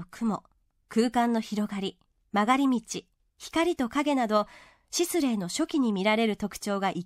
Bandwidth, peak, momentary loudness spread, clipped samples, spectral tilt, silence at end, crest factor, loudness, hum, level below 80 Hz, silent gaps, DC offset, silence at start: 16 kHz; -8 dBFS; 10 LU; under 0.1%; -4.5 dB/octave; 0 s; 18 dB; -28 LUFS; none; -62 dBFS; none; under 0.1%; 0 s